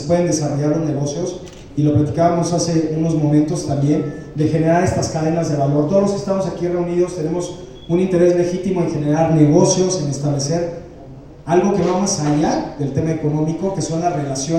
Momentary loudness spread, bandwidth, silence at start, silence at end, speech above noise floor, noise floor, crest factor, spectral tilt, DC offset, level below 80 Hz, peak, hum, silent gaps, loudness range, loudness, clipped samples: 8 LU; 11.5 kHz; 0 s; 0 s; 20 dB; -37 dBFS; 16 dB; -6 dB/octave; under 0.1%; -44 dBFS; -2 dBFS; none; none; 3 LU; -18 LUFS; under 0.1%